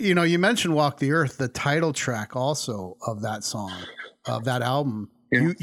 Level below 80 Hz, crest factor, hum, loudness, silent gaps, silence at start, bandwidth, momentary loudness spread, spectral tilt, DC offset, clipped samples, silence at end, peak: -64 dBFS; 18 dB; none; -25 LUFS; none; 0 s; 16.5 kHz; 12 LU; -5 dB/octave; under 0.1%; under 0.1%; 0.1 s; -6 dBFS